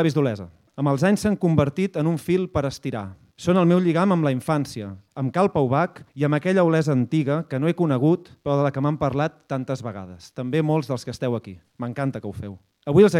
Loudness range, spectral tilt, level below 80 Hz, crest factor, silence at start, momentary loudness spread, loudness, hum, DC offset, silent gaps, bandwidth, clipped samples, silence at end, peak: 5 LU; -7.5 dB/octave; -54 dBFS; 18 dB; 0 s; 15 LU; -23 LUFS; none; under 0.1%; none; 13.5 kHz; under 0.1%; 0 s; -4 dBFS